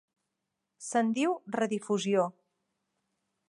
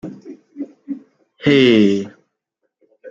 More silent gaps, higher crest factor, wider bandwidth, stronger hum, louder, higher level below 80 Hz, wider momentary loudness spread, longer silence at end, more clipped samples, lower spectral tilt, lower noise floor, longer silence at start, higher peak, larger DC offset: neither; about the same, 18 dB vs 16 dB; first, 11.5 kHz vs 7.8 kHz; neither; second, -30 LUFS vs -14 LUFS; second, -84 dBFS vs -60 dBFS; second, 5 LU vs 23 LU; first, 1.2 s vs 0 s; neither; second, -5 dB/octave vs -6.5 dB/octave; first, -85 dBFS vs -74 dBFS; first, 0.8 s vs 0.05 s; second, -14 dBFS vs -2 dBFS; neither